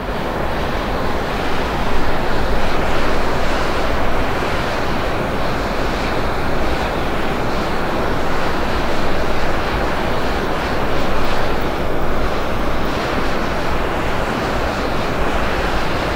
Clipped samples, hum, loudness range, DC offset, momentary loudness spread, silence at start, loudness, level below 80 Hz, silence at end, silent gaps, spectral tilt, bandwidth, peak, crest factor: under 0.1%; none; 1 LU; under 0.1%; 2 LU; 0 s; -20 LUFS; -24 dBFS; 0 s; none; -5.5 dB/octave; 16 kHz; -2 dBFS; 14 dB